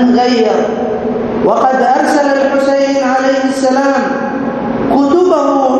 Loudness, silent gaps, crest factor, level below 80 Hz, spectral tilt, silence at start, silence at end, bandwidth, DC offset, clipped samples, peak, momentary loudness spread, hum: -11 LUFS; none; 10 dB; -44 dBFS; -5 dB/octave; 0 s; 0 s; 12 kHz; under 0.1%; under 0.1%; 0 dBFS; 6 LU; none